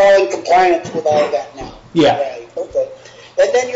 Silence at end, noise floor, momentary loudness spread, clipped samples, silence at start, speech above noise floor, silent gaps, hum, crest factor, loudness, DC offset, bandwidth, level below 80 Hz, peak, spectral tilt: 0 s; -37 dBFS; 14 LU; under 0.1%; 0 s; 24 dB; none; none; 10 dB; -15 LUFS; under 0.1%; 8 kHz; -48 dBFS; -4 dBFS; -4.5 dB/octave